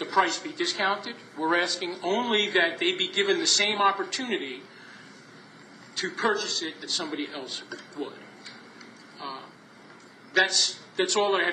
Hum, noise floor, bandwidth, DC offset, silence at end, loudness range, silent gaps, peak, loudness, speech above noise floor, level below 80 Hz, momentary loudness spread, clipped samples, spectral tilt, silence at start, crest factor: none; -50 dBFS; 10 kHz; under 0.1%; 0 s; 10 LU; none; -6 dBFS; -25 LUFS; 24 dB; -84 dBFS; 23 LU; under 0.1%; -1 dB/octave; 0 s; 22 dB